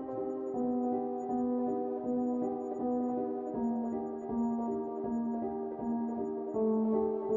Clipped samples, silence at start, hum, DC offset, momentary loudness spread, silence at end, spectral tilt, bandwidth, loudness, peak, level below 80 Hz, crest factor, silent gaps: under 0.1%; 0 s; none; under 0.1%; 5 LU; 0 s; -10.5 dB/octave; 7 kHz; -34 LUFS; -20 dBFS; -66 dBFS; 12 dB; none